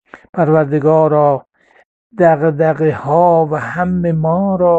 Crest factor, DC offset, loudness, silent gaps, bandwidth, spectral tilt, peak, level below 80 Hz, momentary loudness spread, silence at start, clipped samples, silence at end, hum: 12 dB; under 0.1%; -13 LUFS; 0.29-0.33 s, 1.85-2.10 s; 7.8 kHz; -10 dB/octave; 0 dBFS; -50 dBFS; 6 LU; 0.15 s; under 0.1%; 0 s; none